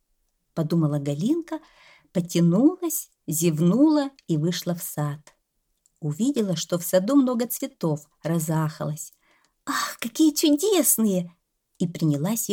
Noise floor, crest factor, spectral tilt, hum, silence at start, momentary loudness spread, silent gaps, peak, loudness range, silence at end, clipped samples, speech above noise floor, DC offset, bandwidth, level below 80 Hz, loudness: -74 dBFS; 18 dB; -5.5 dB/octave; none; 0.55 s; 12 LU; none; -6 dBFS; 3 LU; 0 s; under 0.1%; 50 dB; under 0.1%; 19 kHz; -68 dBFS; -24 LUFS